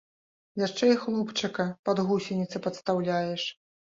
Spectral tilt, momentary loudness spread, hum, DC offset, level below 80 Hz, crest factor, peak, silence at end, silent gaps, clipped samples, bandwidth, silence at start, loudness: -5.5 dB/octave; 8 LU; none; under 0.1%; -70 dBFS; 18 dB; -10 dBFS; 0.45 s; 1.79-1.83 s; under 0.1%; 7.8 kHz; 0.55 s; -28 LUFS